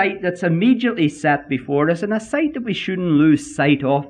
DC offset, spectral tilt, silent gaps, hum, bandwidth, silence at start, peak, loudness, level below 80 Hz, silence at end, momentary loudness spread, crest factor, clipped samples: under 0.1%; -6.5 dB/octave; none; none; 10 kHz; 0 s; -4 dBFS; -18 LUFS; -56 dBFS; 0 s; 6 LU; 14 dB; under 0.1%